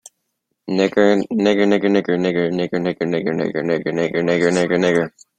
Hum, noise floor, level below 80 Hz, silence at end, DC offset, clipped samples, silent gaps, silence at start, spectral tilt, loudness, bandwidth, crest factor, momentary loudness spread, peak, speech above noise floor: none; -74 dBFS; -58 dBFS; 0.3 s; under 0.1%; under 0.1%; none; 0.65 s; -6 dB/octave; -18 LUFS; 9.6 kHz; 16 dB; 6 LU; -2 dBFS; 57 dB